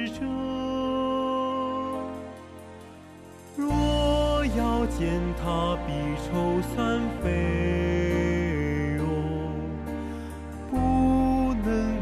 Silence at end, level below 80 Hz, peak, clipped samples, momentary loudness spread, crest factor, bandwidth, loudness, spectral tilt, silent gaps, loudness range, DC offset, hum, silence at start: 0 s; -36 dBFS; -12 dBFS; under 0.1%; 15 LU; 14 dB; 13.5 kHz; -27 LUFS; -7 dB/octave; none; 4 LU; under 0.1%; none; 0 s